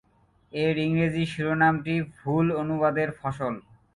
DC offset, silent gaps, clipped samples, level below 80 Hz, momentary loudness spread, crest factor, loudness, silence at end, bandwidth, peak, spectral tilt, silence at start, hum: under 0.1%; none; under 0.1%; -56 dBFS; 9 LU; 18 dB; -26 LUFS; 0.35 s; 11.5 kHz; -8 dBFS; -7.5 dB/octave; 0.55 s; none